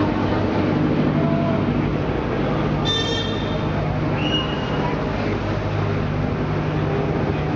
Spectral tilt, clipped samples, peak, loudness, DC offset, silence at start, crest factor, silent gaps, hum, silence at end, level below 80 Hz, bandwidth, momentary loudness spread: -7 dB/octave; under 0.1%; -8 dBFS; -21 LUFS; under 0.1%; 0 s; 12 dB; none; 50 Hz at -35 dBFS; 0 s; -34 dBFS; 7.2 kHz; 3 LU